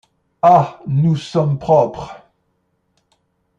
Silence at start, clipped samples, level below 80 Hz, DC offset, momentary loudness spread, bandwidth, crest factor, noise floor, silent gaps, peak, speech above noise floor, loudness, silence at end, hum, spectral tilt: 0.45 s; under 0.1%; -52 dBFS; under 0.1%; 11 LU; 8.8 kHz; 16 dB; -66 dBFS; none; 0 dBFS; 52 dB; -15 LUFS; 1.45 s; none; -8.5 dB/octave